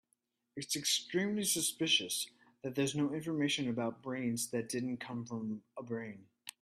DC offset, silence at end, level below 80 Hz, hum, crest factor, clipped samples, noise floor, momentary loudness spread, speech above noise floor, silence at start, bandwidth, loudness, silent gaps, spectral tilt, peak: under 0.1%; 0.1 s; -78 dBFS; none; 20 dB; under 0.1%; -81 dBFS; 14 LU; 45 dB; 0.55 s; 15.5 kHz; -35 LUFS; none; -3 dB/octave; -18 dBFS